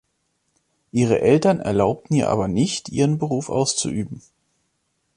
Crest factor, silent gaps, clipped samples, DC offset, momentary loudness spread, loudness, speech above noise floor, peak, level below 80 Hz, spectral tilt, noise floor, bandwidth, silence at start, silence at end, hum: 18 dB; none; under 0.1%; under 0.1%; 10 LU; -20 LUFS; 51 dB; -4 dBFS; -50 dBFS; -5.5 dB/octave; -71 dBFS; 11 kHz; 0.95 s; 1 s; none